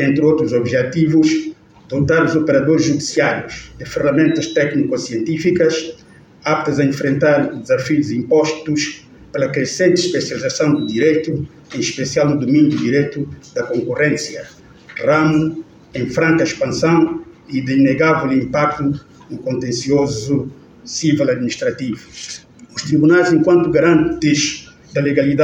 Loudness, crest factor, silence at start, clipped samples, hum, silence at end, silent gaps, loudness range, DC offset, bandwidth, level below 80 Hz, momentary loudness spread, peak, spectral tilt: -16 LUFS; 14 dB; 0 s; under 0.1%; none; 0 s; none; 3 LU; under 0.1%; 9.4 kHz; -48 dBFS; 14 LU; -2 dBFS; -5.5 dB/octave